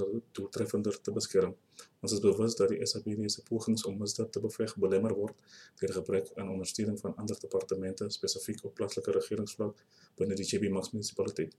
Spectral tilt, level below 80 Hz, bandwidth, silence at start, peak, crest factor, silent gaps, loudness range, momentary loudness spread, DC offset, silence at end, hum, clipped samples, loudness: -4.5 dB/octave; -72 dBFS; 14 kHz; 0 s; -14 dBFS; 20 dB; none; 4 LU; 9 LU; under 0.1%; 0.1 s; none; under 0.1%; -34 LUFS